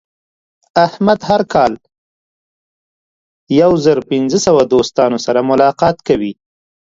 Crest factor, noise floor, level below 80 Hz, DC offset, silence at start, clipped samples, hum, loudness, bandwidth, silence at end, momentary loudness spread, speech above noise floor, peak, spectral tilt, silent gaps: 14 dB; under -90 dBFS; -48 dBFS; under 0.1%; 0.75 s; under 0.1%; none; -13 LUFS; 7.8 kHz; 0.55 s; 6 LU; over 78 dB; 0 dBFS; -5.5 dB/octave; 1.98-3.47 s